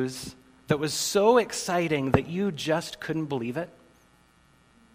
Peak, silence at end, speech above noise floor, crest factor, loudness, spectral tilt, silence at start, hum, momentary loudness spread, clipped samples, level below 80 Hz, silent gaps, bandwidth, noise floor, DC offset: -4 dBFS; 1.25 s; 34 dB; 24 dB; -26 LUFS; -4.5 dB/octave; 0 s; none; 13 LU; under 0.1%; -56 dBFS; none; 16 kHz; -60 dBFS; under 0.1%